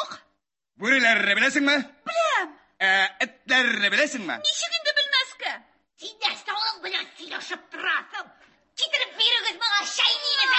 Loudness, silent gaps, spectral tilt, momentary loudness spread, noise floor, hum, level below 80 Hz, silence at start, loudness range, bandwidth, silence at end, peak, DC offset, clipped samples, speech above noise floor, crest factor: -22 LUFS; none; -1 dB/octave; 15 LU; -75 dBFS; none; -78 dBFS; 0 s; 7 LU; 8.6 kHz; 0 s; -6 dBFS; under 0.1%; under 0.1%; 51 dB; 18 dB